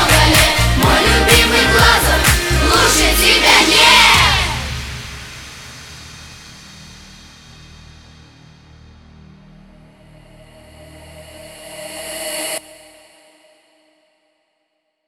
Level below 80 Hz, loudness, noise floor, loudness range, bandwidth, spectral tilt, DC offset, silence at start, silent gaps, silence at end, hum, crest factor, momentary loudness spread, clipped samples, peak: -26 dBFS; -11 LUFS; -69 dBFS; 21 LU; 19.5 kHz; -2.5 dB/octave; under 0.1%; 0 s; none; 2.5 s; none; 16 dB; 26 LU; under 0.1%; 0 dBFS